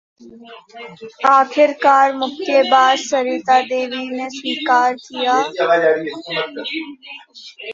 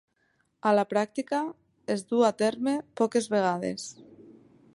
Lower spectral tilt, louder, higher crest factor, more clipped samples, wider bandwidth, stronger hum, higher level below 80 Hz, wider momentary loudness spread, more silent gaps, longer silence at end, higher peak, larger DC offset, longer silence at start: second, -2.5 dB/octave vs -5 dB/octave; first, -16 LUFS vs -27 LUFS; about the same, 16 dB vs 18 dB; neither; second, 7.6 kHz vs 11.5 kHz; neither; first, -68 dBFS vs -74 dBFS; first, 20 LU vs 11 LU; neither; second, 0 s vs 0.45 s; first, -2 dBFS vs -10 dBFS; neither; second, 0.2 s vs 0.65 s